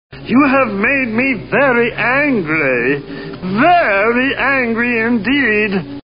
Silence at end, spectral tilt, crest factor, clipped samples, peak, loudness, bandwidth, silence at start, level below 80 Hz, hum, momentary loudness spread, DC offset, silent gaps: 0.05 s; -3.5 dB/octave; 14 dB; under 0.1%; 0 dBFS; -13 LUFS; 5.4 kHz; 0.1 s; -44 dBFS; none; 6 LU; 0.5%; none